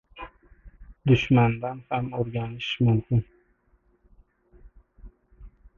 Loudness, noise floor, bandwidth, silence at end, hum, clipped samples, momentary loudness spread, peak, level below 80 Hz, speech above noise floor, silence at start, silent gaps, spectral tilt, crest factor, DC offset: -25 LUFS; -65 dBFS; 6.8 kHz; 0.3 s; none; under 0.1%; 23 LU; -8 dBFS; -48 dBFS; 42 dB; 0.15 s; none; -8 dB/octave; 20 dB; under 0.1%